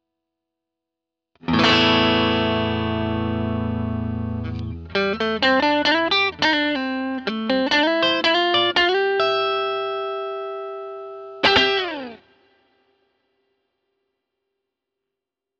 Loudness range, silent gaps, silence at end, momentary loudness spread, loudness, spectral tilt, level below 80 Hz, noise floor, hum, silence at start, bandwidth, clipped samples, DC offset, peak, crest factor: 5 LU; none; 3.45 s; 14 LU; -20 LUFS; -5 dB/octave; -44 dBFS; -85 dBFS; none; 1.45 s; 8 kHz; under 0.1%; under 0.1%; -4 dBFS; 18 dB